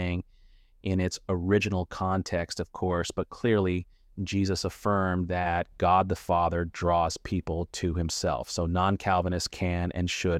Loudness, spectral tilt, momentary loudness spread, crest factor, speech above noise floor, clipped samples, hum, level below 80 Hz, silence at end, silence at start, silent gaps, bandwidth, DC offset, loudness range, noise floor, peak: -28 LUFS; -5.5 dB/octave; 7 LU; 16 dB; 29 dB; under 0.1%; none; -46 dBFS; 0 s; 0 s; none; 14.5 kHz; under 0.1%; 2 LU; -57 dBFS; -12 dBFS